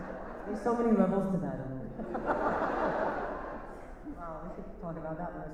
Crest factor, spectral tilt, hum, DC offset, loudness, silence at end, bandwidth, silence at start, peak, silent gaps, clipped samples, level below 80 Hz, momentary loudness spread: 20 dB; -8.5 dB/octave; none; under 0.1%; -33 LUFS; 0 s; 10 kHz; 0 s; -14 dBFS; none; under 0.1%; -50 dBFS; 16 LU